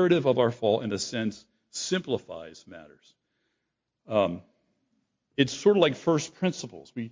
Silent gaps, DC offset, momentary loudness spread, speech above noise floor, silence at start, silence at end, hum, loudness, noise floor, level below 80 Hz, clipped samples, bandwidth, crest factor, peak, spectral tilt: none; under 0.1%; 17 LU; 55 dB; 0 s; 0 s; none; -27 LUFS; -82 dBFS; -64 dBFS; under 0.1%; 7.6 kHz; 20 dB; -8 dBFS; -5 dB/octave